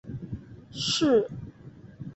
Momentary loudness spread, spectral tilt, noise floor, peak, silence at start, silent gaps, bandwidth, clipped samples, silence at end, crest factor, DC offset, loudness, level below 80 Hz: 22 LU; -4.5 dB/octave; -48 dBFS; -12 dBFS; 0.05 s; none; 8.4 kHz; under 0.1%; 0 s; 18 dB; under 0.1%; -26 LUFS; -54 dBFS